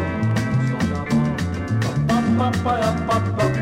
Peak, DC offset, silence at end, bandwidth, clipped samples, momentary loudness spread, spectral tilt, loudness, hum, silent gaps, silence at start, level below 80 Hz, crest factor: -8 dBFS; under 0.1%; 0 s; 15.5 kHz; under 0.1%; 4 LU; -7 dB/octave; -21 LUFS; none; none; 0 s; -40 dBFS; 12 dB